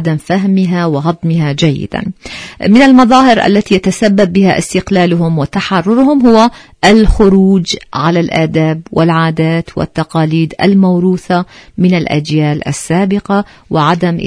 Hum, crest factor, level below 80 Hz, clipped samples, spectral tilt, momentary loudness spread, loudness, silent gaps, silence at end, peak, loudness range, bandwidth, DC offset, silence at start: none; 10 dB; -28 dBFS; 0.7%; -6.5 dB/octave; 8 LU; -10 LUFS; none; 0 s; 0 dBFS; 3 LU; 11 kHz; under 0.1%; 0 s